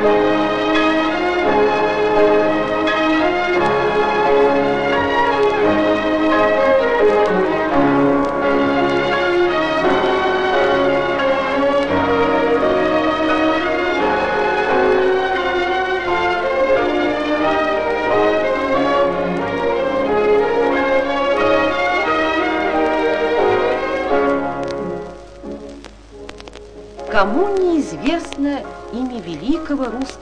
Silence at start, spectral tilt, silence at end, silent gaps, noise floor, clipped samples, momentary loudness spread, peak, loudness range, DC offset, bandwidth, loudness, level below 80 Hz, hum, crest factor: 0 s; -5.5 dB/octave; 0 s; none; -37 dBFS; under 0.1%; 8 LU; 0 dBFS; 6 LU; under 0.1%; 9.8 kHz; -16 LUFS; -42 dBFS; none; 16 dB